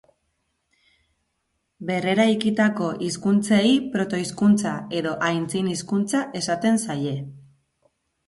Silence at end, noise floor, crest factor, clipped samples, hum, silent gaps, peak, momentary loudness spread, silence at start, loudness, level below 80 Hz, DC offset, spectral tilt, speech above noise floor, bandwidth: 0.9 s; -75 dBFS; 16 dB; under 0.1%; none; none; -8 dBFS; 8 LU; 1.8 s; -22 LUFS; -62 dBFS; under 0.1%; -5 dB/octave; 53 dB; 11.5 kHz